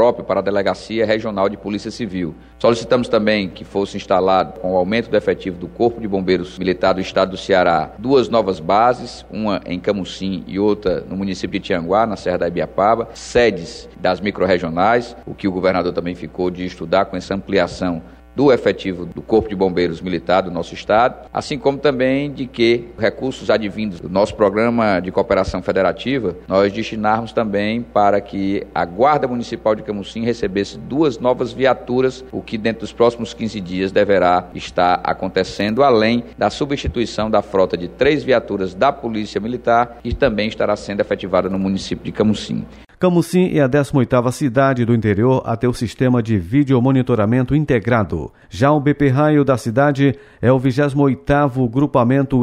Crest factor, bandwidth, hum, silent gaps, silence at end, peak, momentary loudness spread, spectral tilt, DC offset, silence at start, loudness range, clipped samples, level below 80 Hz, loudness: 16 dB; 13 kHz; none; none; 0 s; -2 dBFS; 9 LU; -6.5 dB/octave; under 0.1%; 0 s; 3 LU; under 0.1%; -42 dBFS; -18 LUFS